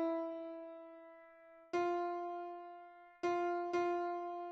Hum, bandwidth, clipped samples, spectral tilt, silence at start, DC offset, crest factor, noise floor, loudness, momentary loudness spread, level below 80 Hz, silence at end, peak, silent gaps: none; 7.2 kHz; under 0.1%; -5 dB/octave; 0 s; under 0.1%; 14 dB; -61 dBFS; -40 LUFS; 21 LU; -86 dBFS; 0 s; -26 dBFS; none